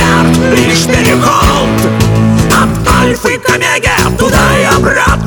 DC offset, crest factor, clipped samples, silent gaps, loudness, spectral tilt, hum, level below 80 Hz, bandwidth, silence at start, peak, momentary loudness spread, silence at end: under 0.1%; 8 dB; under 0.1%; none; -8 LUFS; -4.5 dB/octave; none; -20 dBFS; over 20 kHz; 0 s; 0 dBFS; 2 LU; 0 s